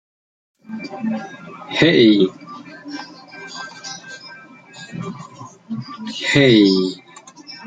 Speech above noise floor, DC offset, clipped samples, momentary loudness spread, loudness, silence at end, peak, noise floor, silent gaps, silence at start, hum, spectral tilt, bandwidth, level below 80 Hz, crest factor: 26 dB; under 0.1%; under 0.1%; 24 LU; -16 LUFS; 0 s; -2 dBFS; -41 dBFS; none; 0.7 s; none; -5.5 dB/octave; 9.2 kHz; -56 dBFS; 18 dB